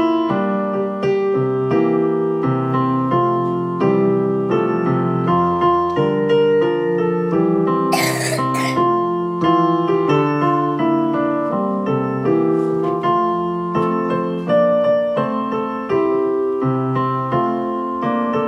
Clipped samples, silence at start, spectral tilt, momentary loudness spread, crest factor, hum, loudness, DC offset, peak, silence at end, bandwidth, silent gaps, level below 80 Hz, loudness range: under 0.1%; 0 s; -7 dB/octave; 4 LU; 14 dB; none; -18 LUFS; under 0.1%; -4 dBFS; 0 s; 15.5 kHz; none; -56 dBFS; 2 LU